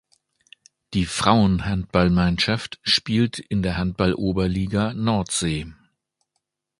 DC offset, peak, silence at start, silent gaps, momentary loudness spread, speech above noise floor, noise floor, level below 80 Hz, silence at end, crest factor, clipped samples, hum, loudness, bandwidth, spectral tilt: under 0.1%; 0 dBFS; 0.9 s; none; 7 LU; 56 dB; -78 dBFS; -40 dBFS; 1.1 s; 22 dB; under 0.1%; none; -22 LUFS; 11.5 kHz; -5 dB/octave